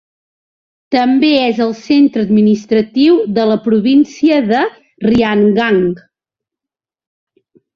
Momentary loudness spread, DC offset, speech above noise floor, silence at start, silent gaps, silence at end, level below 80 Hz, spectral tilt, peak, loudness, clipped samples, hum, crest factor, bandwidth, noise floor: 6 LU; under 0.1%; 75 dB; 0.9 s; none; 1.75 s; -48 dBFS; -7 dB/octave; -2 dBFS; -12 LUFS; under 0.1%; none; 12 dB; 7 kHz; -86 dBFS